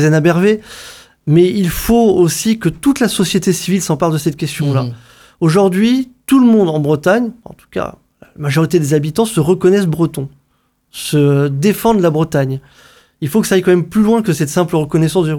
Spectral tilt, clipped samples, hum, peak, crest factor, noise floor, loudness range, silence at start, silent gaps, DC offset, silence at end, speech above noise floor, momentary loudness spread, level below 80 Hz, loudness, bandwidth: -6 dB/octave; under 0.1%; none; 0 dBFS; 14 dB; -61 dBFS; 2 LU; 0 s; none; under 0.1%; 0 s; 48 dB; 12 LU; -40 dBFS; -13 LUFS; 19.5 kHz